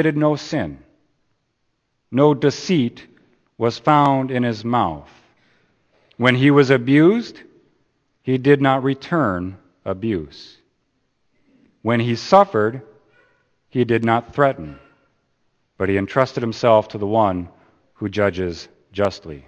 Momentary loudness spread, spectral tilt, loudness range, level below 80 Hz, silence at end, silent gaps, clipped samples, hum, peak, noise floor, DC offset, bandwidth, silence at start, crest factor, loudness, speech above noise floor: 16 LU; -7 dB/octave; 5 LU; -54 dBFS; 0.1 s; none; under 0.1%; none; 0 dBFS; -70 dBFS; under 0.1%; 8.6 kHz; 0 s; 20 dB; -19 LUFS; 52 dB